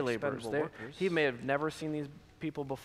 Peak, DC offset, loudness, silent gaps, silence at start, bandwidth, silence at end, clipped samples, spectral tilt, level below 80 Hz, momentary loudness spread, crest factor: -16 dBFS; under 0.1%; -35 LUFS; none; 0 s; 15 kHz; 0 s; under 0.1%; -6 dB/octave; -66 dBFS; 10 LU; 18 dB